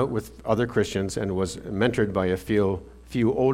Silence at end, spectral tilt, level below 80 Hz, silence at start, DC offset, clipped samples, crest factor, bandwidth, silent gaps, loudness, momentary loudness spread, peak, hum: 0 s; -6.5 dB/octave; -46 dBFS; 0 s; under 0.1%; under 0.1%; 18 dB; 16 kHz; none; -26 LUFS; 6 LU; -6 dBFS; none